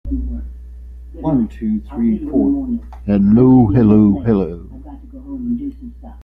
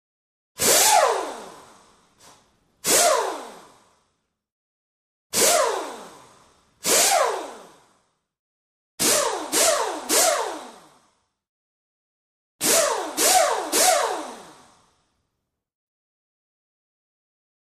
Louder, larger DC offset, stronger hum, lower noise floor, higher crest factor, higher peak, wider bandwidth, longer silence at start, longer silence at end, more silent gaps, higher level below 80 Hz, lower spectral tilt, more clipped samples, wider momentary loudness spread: first, -15 LUFS vs -19 LUFS; neither; neither; second, -34 dBFS vs -79 dBFS; second, 14 dB vs 20 dB; about the same, -2 dBFS vs -4 dBFS; second, 3.7 kHz vs 15.5 kHz; second, 0.05 s vs 0.6 s; second, 0 s vs 3.15 s; second, none vs 4.52-5.30 s, 8.39-8.98 s, 11.49-12.59 s; first, -30 dBFS vs -66 dBFS; first, -12 dB/octave vs 0 dB/octave; neither; first, 25 LU vs 16 LU